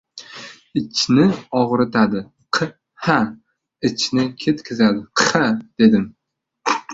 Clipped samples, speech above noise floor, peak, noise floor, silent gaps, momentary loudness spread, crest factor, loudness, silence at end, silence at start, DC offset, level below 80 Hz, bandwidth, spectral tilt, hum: under 0.1%; 60 dB; -2 dBFS; -78 dBFS; none; 12 LU; 18 dB; -19 LUFS; 0 s; 0.15 s; under 0.1%; -56 dBFS; 7.8 kHz; -4.5 dB/octave; none